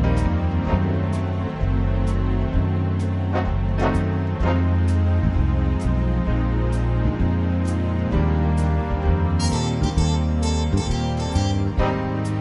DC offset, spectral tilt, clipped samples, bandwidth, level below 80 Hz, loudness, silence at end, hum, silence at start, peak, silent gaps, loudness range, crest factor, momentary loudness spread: under 0.1%; -7 dB/octave; under 0.1%; 11 kHz; -26 dBFS; -22 LUFS; 0 s; none; 0 s; -6 dBFS; none; 1 LU; 14 dB; 3 LU